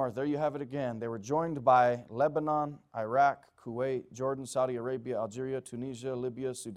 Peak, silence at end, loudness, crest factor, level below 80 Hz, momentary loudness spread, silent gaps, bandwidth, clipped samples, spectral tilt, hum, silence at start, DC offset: -12 dBFS; 0 s; -32 LUFS; 20 dB; -70 dBFS; 12 LU; none; 13.5 kHz; under 0.1%; -6 dB/octave; none; 0 s; under 0.1%